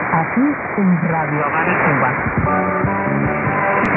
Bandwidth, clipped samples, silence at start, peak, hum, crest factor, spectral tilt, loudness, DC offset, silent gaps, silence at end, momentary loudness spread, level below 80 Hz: 4.1 kHz; under 0.1%; 0 s; -4 dBFS; none; 12 dB; -10.5 dB/octave; -17 LUFS; under 0.1%; none; 0 s; 3 LU; -40 dBFS